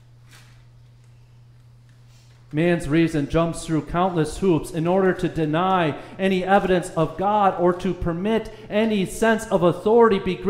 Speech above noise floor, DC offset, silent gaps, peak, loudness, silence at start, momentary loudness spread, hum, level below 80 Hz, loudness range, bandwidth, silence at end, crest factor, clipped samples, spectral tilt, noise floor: 29 dB; under 0.1%; none; -4 dBFS; -21 LUFS; 0.35 s; 7 LU; none; -42 dBFS; 5 LU; 15.5 kHz; 0 s; 18 dB; under 0.1%; -6.5 dB/octave; -49 dBFS